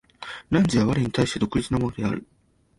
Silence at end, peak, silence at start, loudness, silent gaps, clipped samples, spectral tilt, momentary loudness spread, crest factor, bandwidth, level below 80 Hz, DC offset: 0.55 s; -8 dBFS; 0.2 s; -24 LUFS; none; under 0.1%; -6 dB/octave; 12 LU; 16 dB; 11.5 kHz; -46 dBFS; under 0.1%